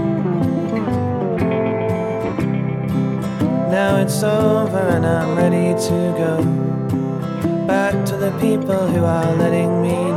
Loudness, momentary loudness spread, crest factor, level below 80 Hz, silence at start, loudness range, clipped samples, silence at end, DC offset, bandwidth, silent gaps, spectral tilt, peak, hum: -18 LUFS; 5 LU; 14 dB; -46 dBFS; 0 s; 3 LU; under 0.1%; 0 s; under 0.1%; 15.5 kHz; none; -7 dB/octave; -4 dBFS; none